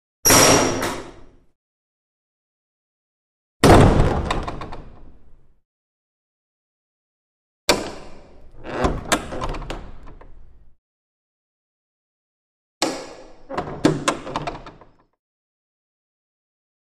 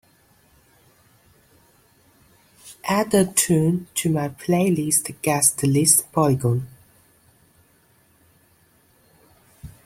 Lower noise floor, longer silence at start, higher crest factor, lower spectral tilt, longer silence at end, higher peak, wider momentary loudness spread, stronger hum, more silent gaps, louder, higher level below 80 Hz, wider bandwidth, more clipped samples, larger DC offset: second, -50 dBFS vs -59 dBFS; second, 0.25 s vs 2.65 s; about the same, 24 dB vs 22 dB; about the same, -4 dB/octave vs -4.5 dB/octave; first, 2.25 s vs 0.15 s; about the same, 0 dBFS vs -2 dBFS; first, 23 LU vs 8 LU; neither; first, 1.55-3.60 s, 5.65-7.68 s, 10.78-12.81 s vs none; about the same, -18 LUFS vs -20 LUFS; first, -34 dBFS vs -56 dBFS; about the same, 15 kHz vs 16.5 kHz; neither; neither